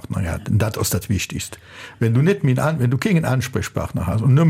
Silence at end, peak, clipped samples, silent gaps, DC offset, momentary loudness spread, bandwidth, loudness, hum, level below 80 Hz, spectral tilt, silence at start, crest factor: 0 s; -6 dBFS; under 0.1%; none; under 0.1%; 9 LU; 16 kHz; -20 LUFS; none; -40 dBFS; -6 dB/octave; 0.1 s; 14 dB